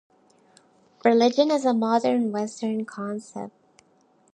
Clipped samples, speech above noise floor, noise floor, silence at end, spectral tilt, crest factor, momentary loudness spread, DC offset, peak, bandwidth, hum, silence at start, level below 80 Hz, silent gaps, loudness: under 0.1%; 39 dB; -62 dBFS; 0.85 s; -5 dB/octave; 20 dB; 16 LU; under 0.1%; -6 dBFS; 9.4 kHz; none; 1.05 s; -78 dBFS; none; -23 LUFS